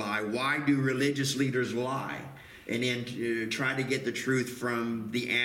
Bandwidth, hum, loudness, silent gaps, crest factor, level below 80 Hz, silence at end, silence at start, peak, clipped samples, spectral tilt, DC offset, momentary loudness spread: 16.5 kHz; none; -30 LUFS; none; 16 dB; -66 dBFS; 0 s; 0 s; -14 dBFS; under 0.1%; -4.5 dB/octave; under 0.1%; 8 LU